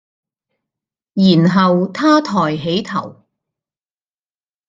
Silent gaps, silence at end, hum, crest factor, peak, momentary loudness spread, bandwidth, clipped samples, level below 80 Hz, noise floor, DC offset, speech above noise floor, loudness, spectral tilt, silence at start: none; 1.6 s; none; 16 dB; -2 dBFS; 12 LU; 7.6 kHz; under 0.1%; -58 dBFS; under -90 dBFS; under 0.1%; over 76 dB; -14 LUFS; -7 dB/octave; 1.15 s